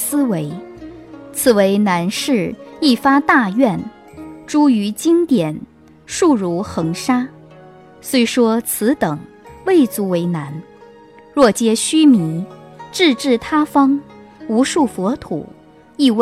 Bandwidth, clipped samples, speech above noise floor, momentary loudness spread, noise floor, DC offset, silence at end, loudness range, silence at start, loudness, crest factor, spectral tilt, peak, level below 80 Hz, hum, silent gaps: 16 kHz; under 0.1%; 27 dB; 18 LU; -42 dBFS; under 0.1%; 0 s; 3 LU; 0 s; -16 LUFS; 16 dB; -4.5 dB/octave; 0 dBFS; -52 dBFS; none; none